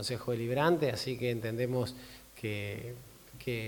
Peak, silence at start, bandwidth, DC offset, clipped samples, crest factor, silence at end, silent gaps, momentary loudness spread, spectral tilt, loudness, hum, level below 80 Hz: -16 dBFS; 0 s; 19 kHz; under 0.1%; under 0.1%; 18 dB; 0 s; none; 19 LU; -5.5 dB/octave; -34 LUFS; none; -62 dBFS